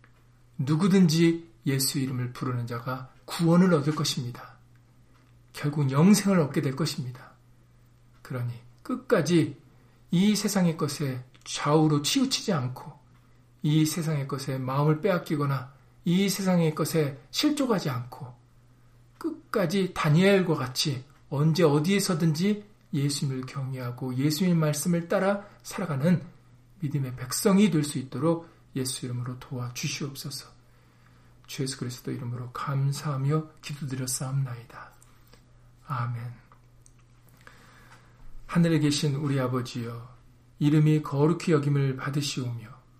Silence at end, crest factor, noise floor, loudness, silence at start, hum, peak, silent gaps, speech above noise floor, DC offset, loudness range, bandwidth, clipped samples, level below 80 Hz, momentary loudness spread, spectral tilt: 0.25 s; 18 dB; -57 dBFS; -27 LUFS; 0.6 s; none; -10 dBFS; none; 31 dB; under 0.1%; 8 LU; 15.5 kHz; under 0.1%; -60 dBFS; 15 LU; -5.5 dB/octave